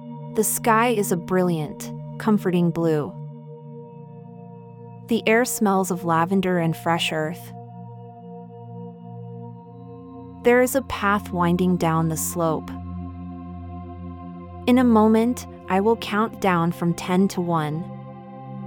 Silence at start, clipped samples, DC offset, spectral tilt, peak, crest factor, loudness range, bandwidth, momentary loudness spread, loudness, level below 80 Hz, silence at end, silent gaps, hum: 0 s; under 0.1%; under 0.1%; -5.5 dB/octave; -6 dBFS; 18 dB; 5 LU; 19.5 kHz; 21 LU; -21 LUFS; -52 dBFS; 0 s; none; none